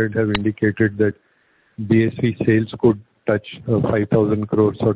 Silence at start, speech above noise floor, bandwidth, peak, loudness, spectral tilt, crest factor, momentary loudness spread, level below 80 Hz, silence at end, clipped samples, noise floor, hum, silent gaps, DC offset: 0 s; 42 dB; 4 kHz; -2 dBFS; -19 LUFS; -12 dB/octave; 16 dB; 5 LU; -46 dBFS; 0 s; under 0.1%; -60 dBFS; none; none; under 0.1%